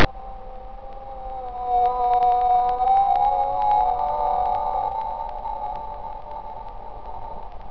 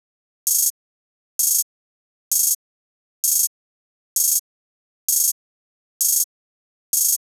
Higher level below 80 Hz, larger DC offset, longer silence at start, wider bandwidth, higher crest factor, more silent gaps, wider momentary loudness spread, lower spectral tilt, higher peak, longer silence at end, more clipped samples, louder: first, -38 dBFS vs under -90 dBFS; first, 0.8% vs under 0.1%; second, 0 s vs 0.45 s; second, 5.4 kHz vs over 20 kHz; about the same, 16 dB vs 18 dB; second, none vs 0.70-1.39 s, 1.63-2.31 s, 2.55-3.23 s, 3.47-4.16 s, 4.39-5.08 s, 5.32-6.00 s, 6.24-6.93 s; first, 20 LU vs 8 LU; first, -6.5 dB/octave vs 13.5 dB/octave; about the same, -6 dBFS vs -6 dBFS; second, 0 s vs 0.2 s; neither; second, -22 LUFS vs -19 LUFS